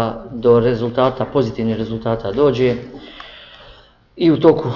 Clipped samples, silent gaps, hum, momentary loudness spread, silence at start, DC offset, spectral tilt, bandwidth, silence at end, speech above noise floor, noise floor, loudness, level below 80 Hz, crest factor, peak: under 0.1%; none; none; 21 LU; 0 s; under 0.1%; -8.5 dB/octave; 6 kHz; 0 s; 29 dB; -46 dBFS; -17 LUFS; -44 dBFS; 16 dB; 0 dBFS